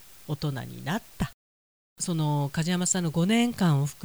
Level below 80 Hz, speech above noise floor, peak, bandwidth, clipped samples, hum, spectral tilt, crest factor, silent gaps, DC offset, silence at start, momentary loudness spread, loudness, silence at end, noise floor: -52 dBFS; over 63 dB; -12 dBFS; over 20 kHz; under 0.1%; none; -5 dB/octave; 16 dB; 1.34-1.96 s; 0.2%; 0.3 s; 11 LU; -27 LUFS; 0 s; under -90 dBFS